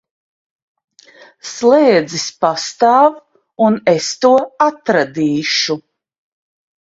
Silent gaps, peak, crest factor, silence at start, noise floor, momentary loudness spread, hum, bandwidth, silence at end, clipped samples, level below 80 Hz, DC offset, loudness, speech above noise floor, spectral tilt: none; 0 dBFS; 16 dB; 1.45 s; -44 dBFS; 8 LU; none; 7.8 kHz; 1.05 s; under 0.1%; -62 dBFS; under 0.1%; -14 LUFS; 31 dB; -4 dB/octave